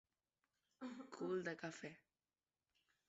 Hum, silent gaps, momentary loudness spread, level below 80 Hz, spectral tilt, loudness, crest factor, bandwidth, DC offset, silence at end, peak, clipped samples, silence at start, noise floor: none; none; 12 LU; under -90 dBFS; -5 dB/octave; -49 LUFS; 20 dB; 7.6 kHz; under 0.1%; 1.1 s; -32 dBFS; under 0.1%; 0.8 s; under -90 dBFS